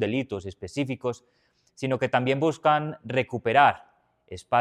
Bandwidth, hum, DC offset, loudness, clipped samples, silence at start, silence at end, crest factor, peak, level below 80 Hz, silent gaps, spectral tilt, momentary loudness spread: 11 kHz; none; under 0.1%; -25 LUFS; under 0.1%; 0 s; 0 s; 22 dB; -4 dBFS; -64 dBFS; none; -6 dB/octave; 16 LU